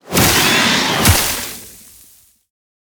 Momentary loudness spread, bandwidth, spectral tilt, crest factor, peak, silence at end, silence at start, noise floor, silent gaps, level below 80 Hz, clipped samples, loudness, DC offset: 14 LU; over 20 kHz; -2.5 dB/octave; 16 dB; 0 dBFS; 1.15 s; 0.05 s; -48 dBFS; none; -32 dBFS; under 0.1%; -12 LUFS; under 0.1%